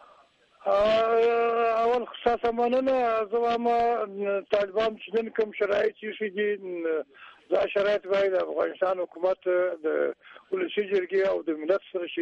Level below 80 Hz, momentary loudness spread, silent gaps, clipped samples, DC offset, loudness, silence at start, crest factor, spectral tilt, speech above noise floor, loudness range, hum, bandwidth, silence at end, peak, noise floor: -62 dBFS; 7 LU; none; under 0.1%; under 0.1%; -26 LUFS; 0.65 s; 18 dB; -5.5 dB/octave; 33 dB; 4 LU; none; 7.6 kHz; 0 s; -8 dBFS; -59 dBFS